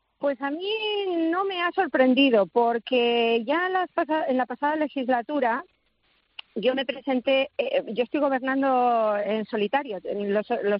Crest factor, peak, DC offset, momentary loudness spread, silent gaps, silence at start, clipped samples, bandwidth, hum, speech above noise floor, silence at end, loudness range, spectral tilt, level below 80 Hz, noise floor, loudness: 16 dB; -8 dBFS; under 0.1%; 7 LU; none; 0.2 s; under 0.1%; 5.6 kHz; none; 44 dB; 0 s; 4 LU; -8.5 dB/octave; -74 dBFS; -68 dBFS; -24 LUFS